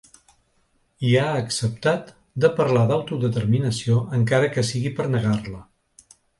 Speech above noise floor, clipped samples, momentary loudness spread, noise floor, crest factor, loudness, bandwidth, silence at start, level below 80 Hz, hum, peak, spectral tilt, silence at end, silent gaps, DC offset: 44 dB; under 0.1%; 8 LU; -65 dBFS; 18 dB; -22 LUFS; 11.5 kHz; 1 s; -52 dBFS; none; -4 dBFS; -6 dB/octave; 0.75 s; none; under 0.1%